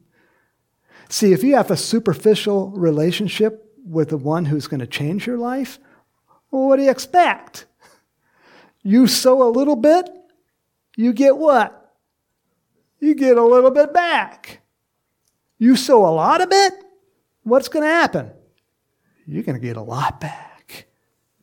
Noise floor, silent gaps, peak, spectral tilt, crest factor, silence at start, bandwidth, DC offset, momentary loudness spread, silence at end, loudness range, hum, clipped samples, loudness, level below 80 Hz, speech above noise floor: -73 dBFS; none; 0 dBFS; -5 dB/octave; 18 dB; 1.1 s; 17.5 kHz; under 0.1%; 14 LU; 0.65 s; 6 LU; none; under 0.1%; -17 LUFS; -62 dBFS; 57 dB